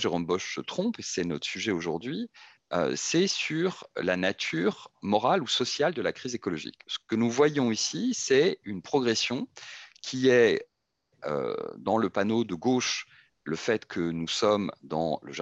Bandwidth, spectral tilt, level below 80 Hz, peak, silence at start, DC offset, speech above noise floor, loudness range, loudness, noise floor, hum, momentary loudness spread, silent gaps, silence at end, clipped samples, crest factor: 8.6 kHz; -4 dB/octave; -70 dBFS; -10 dBFS; 0 s; under 0.1%; 47 dB; 3 LU; -28 LUFS; -75 dBFS; none; 12 LU; none; 0 s; under 0.1%; 18 dB